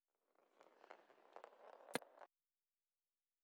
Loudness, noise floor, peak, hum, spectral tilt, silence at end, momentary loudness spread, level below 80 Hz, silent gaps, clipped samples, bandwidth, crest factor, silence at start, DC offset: -55 LUFS; under -90 dBFS; -26 dBFS; none; -2.5 dB/octave; 1.2 s; 16 LU; under -90 dBFS; none; under 0.1%; 8.2 kHz; 34 dB; 0.4 s; under 0.1%